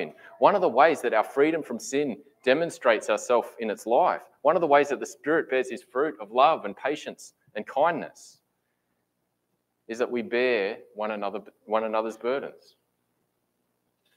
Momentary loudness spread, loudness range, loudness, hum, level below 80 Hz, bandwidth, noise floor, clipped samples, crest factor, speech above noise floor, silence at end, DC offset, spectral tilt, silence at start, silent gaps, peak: 13 LU; 8 LU; -25 LUFS; 60 Hz at -65 dBFS; -80 dBFS; 16 kHz; -77 dBFS; under 0.1%; 22 dB; 52 dB; 1.65 s; under 0.1%; -4 dB/octave; 0 s; none; -4 dBFS